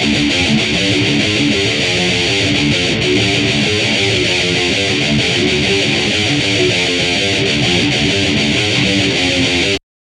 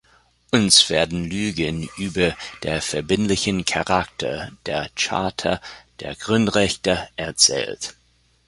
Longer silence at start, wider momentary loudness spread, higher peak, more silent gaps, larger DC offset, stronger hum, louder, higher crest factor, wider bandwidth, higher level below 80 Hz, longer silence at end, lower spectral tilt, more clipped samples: second, 0 s vs 0.55 s; second, 1 LU vs 14 LU; about the same, -2 dBFS vs 0 dBFS; neither; neither; neither; first, -12 LUFS vs -20 LUFS; second, 12 dB vs 22 dB; about the same, 12 kHz vs 11.5 kHz; first, -36 dBFS vs -46 dBFS; second, 0.25 s vs 0.55 s; about the same, -3.5 dB/octave vs -3 dB/octave; neither